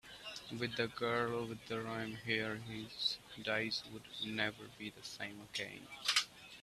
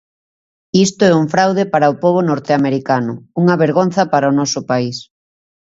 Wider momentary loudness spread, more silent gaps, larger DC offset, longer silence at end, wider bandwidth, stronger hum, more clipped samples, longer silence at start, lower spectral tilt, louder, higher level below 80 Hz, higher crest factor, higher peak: first, 12 LU vs 6 LU; neither; neither; second, 0 s vs 0.75 s; first, 15 kHz vs 8 kHz; neither; neither; second, 0.05 s vs 0.75 s; second, -3 dB/octave vs -5.5 dB/octave; second, -40 LUFS vs -15 LUFS; second, -72 dBFS vs -58 dBFS; first, 24 dB vs 14 dB; second, -18 dBFS vs 0 dBFS